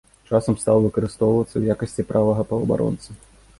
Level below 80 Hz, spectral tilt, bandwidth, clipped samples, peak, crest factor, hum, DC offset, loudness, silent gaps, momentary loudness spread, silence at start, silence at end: -46 dBFS; -8 dB/octave; 11.5 kHz; under 0.1%; -4 dBFS; 18 dB; none; under 0.1%; -21 LUFS; none; 5 LU; 0.3 s; 0.45 s